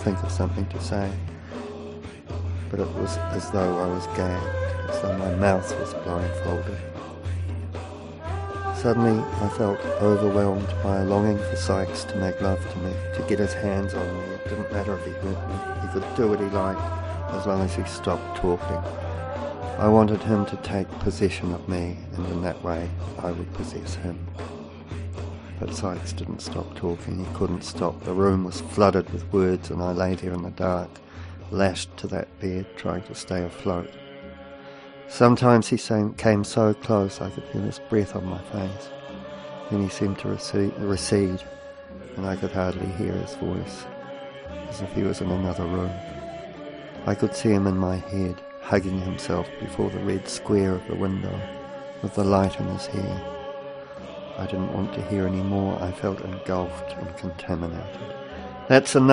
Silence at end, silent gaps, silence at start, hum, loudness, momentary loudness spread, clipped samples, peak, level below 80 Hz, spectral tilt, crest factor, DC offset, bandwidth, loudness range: 0 s; none; 0 s; none; -26 LUFS; 15 LU; under 0.1%; -2 dBFS; -46 dBFS; -6.5 dB/octave; 24 dB; under 0.1%; 10.5 kHz; 7 LU